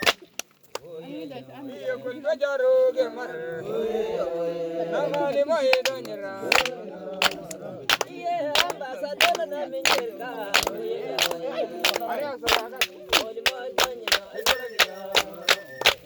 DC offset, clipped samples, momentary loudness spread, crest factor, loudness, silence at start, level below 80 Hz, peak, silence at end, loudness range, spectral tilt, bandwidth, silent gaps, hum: under 0.1%; under 0.1%; 15 LU; 24 dB; -24 LUFS; 0 s; -58 dBFS; -2 dBFS; 0 s; 3 LU; -1.5 dB/octave; over 20 kHz; none; none